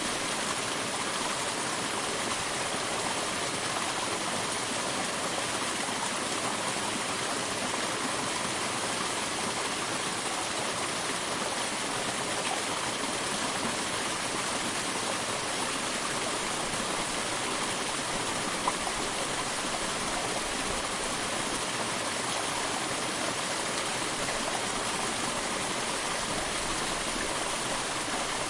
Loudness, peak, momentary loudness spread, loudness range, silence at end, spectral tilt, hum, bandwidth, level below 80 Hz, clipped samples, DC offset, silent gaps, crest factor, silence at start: -30 LUFS; -14 dBFS; 1 LU; 0 LU; 0 s; -1.5 dB/octave; none; 11.5 kHz; -54 dBFS; under 0.1%; under 0.1%; none; 18 dB; 0 s